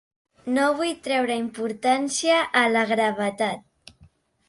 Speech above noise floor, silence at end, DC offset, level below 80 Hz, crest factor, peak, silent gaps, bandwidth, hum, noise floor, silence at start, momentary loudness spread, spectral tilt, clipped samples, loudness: 34 dB; 0.9 s; under 0.1%; -66 dBFS; 18 dB; -6 dBFS; none; 11.5 kHz; none; -57 dBFS; 0.45 s; 8 LU; -3 dB/octave; under 0.1%; -23 LUFS